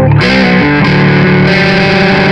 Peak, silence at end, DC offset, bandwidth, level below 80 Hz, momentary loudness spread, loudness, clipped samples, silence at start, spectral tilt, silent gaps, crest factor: 0 dBFS; 0 s; under 0.1%; 8.8 kHz; -30 dBFS; 0 LU; -7 LUFS; under 0.1%; 0 s; -7 dB/octave; none; 6 dB